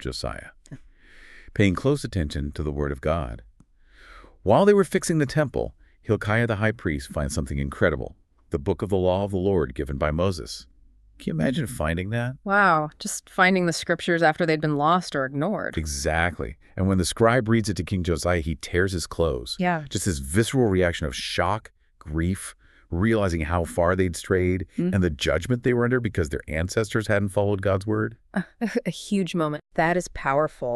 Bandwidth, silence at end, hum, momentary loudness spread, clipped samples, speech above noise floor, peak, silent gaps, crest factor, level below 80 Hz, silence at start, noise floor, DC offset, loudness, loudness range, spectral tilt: 13.5 kHz; 0 s; none; 10 LU; under 0.1%; 31 dB; -4 dBFS; none; 20 dB; -42 dBFS; 0 s; -55 dBFS; under 0.1%; -24 LUFS; 4 LU; -5.5 dB/octave